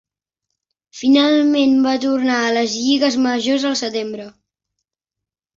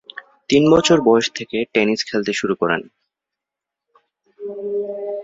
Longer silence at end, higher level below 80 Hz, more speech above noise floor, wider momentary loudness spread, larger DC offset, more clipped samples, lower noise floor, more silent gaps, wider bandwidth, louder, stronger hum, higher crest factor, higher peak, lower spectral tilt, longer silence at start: first, 1.25 s vs 0 s; second, -62 dBFS vs -54 dBFS; about the same, 69 dB vs 69 dB; second, 9 LU vs 18 LU; neither; neither; about the same, -85 dBFS vs -85 dBFS; neither; about the same, 7.6 kHz vs 7.8 kHz; about the same, -16 LUFS vs -18 LUFS; neither; about the same, 16 dB vs 18 dB; about the same, -4 dBFS vs -2 dBFS; second, -3 dB/octave vs -4.5 dB/octave; first, 0.95 s vs 0.15 s